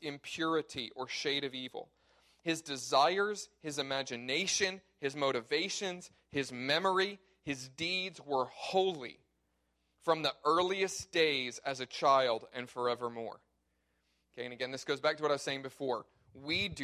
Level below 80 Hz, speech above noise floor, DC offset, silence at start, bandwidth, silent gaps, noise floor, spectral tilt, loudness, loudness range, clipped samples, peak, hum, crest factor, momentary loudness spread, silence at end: -70 dBFS; 44 dB; under 0.1%; 0 s; 14.5 kHz; none; -79 dBFS; -3 dB/octave; -34 LUFS; 5 LU; under 0.1%; -14 dBFS; none; 22 dB; 12 LU; 0 s